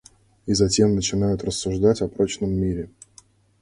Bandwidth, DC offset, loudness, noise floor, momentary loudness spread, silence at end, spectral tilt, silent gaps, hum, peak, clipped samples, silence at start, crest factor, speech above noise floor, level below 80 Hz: 11.5 kHz; under 0.1%; -22 LUFS; -54 dBFS; 10 LU; 0.75 s; -5.5 dB/octave; none; none; -4 dBFS; under 0.1%; 0.45 s; 18 dB; 33 dB; -42 dBFS